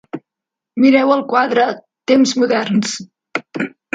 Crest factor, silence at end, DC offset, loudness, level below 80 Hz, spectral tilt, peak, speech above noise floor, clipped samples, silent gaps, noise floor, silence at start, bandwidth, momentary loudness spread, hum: 16 dB; 0.25 s; under 0.1%; -15 LUFS; -66 dBFS; -4.5 dB/octave; 0 dBFS; 70 dB; under 0.1%; none; -84 dBFS; 0.15 s; 9.2 kHz; 15 LU; none